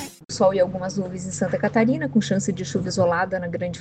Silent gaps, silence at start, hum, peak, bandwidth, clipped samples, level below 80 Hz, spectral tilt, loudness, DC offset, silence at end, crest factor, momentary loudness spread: none; 0 s; none; -6 dBFS; 13.5 kHz; under 0.1%; -54 dBFS; -5.5 dB/octave; -23 LUFS; under 0.1%; 0 s; 16 dB; 8 LU